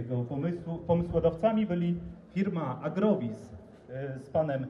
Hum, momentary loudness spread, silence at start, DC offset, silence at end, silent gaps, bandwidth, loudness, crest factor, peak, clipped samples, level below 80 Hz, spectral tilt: none; 13 LU; 0 s; under 0.1%; 0 s; none; 7 kHz; -31 LUFS; 18 dB; -14 dBFS; under 0.1%; -52 dBFS; -9.5 dB/octave